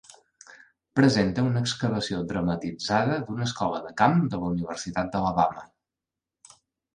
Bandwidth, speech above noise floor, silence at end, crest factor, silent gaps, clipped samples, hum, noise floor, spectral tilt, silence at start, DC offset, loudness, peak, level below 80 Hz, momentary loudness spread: 10.5 kHz; 63 dB; 1.3 s; 20 dB; none; under 0.1%; none; -89 dBFS; -6 dB/octave; 0.5 s; under 0.1%; -26 LUFS; -6 dBFS; -54 dBFS; 8 LU